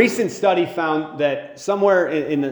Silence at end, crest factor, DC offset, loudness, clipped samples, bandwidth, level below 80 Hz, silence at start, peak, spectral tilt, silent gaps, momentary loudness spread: 0 s; 18 dB; under 0.1%; -20 LUFS; under 0.1%; over 20 kHz; -66 dBFS; 0 s; 0 dBFS; -5 dB/octave; none; 6 LU